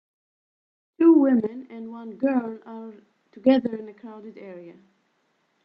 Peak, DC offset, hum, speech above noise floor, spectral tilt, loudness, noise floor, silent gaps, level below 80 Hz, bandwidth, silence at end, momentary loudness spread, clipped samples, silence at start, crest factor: -6 dBFS; under 0.1%; none; 44 dB; -9 dB/octave; -21 LUFS; -70 dBFS; none; -76 dBFS; 5.6 kHz; 0.95 s; 24 LU; under 0.1%; 1 s; 20 dB